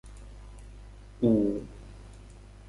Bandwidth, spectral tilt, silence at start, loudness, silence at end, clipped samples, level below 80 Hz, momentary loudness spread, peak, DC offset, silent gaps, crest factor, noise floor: 11.5 kHz; -9 dB/octave; 0.05 s; -27 LUFS; 0.35 s; under 0.1%; -48 dBFS; 26 LU; -12 dBFS; under 0.1%; none; 20 dB; -48 dBFS